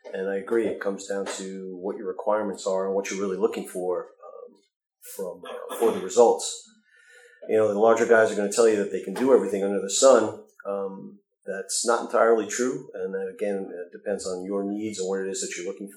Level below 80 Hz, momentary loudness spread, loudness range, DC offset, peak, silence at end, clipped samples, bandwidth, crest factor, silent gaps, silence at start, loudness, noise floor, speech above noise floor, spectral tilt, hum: -76 dBFS; 16 LU; 8 LU; under 0.1%; -4 dBFS; 0 s; under 0.1%; 19.5 kHz; 20 dB; 4.76-4.80 s; 0.05 s; -25 LUFS; -55 dBFS; 31 dB; -3.5 dB/octave; none